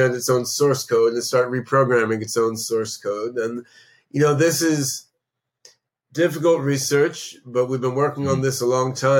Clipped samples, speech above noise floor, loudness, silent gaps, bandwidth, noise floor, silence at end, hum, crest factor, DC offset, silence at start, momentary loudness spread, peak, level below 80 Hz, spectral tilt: under 0.1%; 60 dB; -21 LUFS; none; 17 kHz; -80 dBFS; 0 s; none; 14 dB; under 0.1%; 0 s; 8 LU; -6 dBFS; -66 dBFS; -4.5 dB/octave